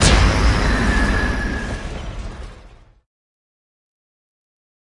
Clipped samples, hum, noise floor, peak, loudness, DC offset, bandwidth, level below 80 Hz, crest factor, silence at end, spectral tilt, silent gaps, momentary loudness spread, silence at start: under 0.1%; none; -45 dBFS; 0 dBFS; -19 LUFS; under 0.1%; 11.5 kHz; -24 dBFS; 20 dB; 2.3 s; -4.5 dB/octave; none; 18 LU; 0 s